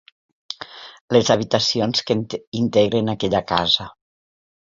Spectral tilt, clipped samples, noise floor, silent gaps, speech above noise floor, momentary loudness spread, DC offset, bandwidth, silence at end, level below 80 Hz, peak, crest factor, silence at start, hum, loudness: -4.5 dB/octave; under 0.1%; -39 dBFS; 1.01-1.08 s, 2.47-2.52 s; 20 dB; 17 LU; under 0.1%; 7.6 kHz; 0.85 s; -52 dBFS; -2 dBFS; 20 dB; 0.5 s; none; -19 LUFS